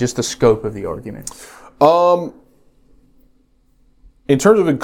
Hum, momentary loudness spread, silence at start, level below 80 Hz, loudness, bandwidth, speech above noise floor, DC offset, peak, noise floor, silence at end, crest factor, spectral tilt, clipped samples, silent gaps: none; 19 LU; 0 s; -46 dBFS; -15 LUFS; 16.5 kHz; 40 dB; under 0.1%; 0 dBFS; -56 dBFS; 0 s; 18 dB; -5.5 dB/octave; under 0.1%; none